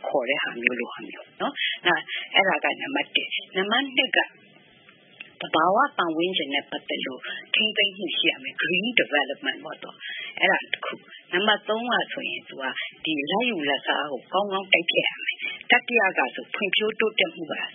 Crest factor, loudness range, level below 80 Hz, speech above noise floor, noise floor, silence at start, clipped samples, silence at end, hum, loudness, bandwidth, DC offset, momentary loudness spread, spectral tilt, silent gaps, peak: 26 dB; 3 LU; -82 dBFS; 29 dB; -54 dBFS; 0 s; under 0.1%; 0 s; none; -24 LUFS; 3.8 kHz; under 0.1%; 11 LU; -7.5 dB/octave; none; 0 dBFS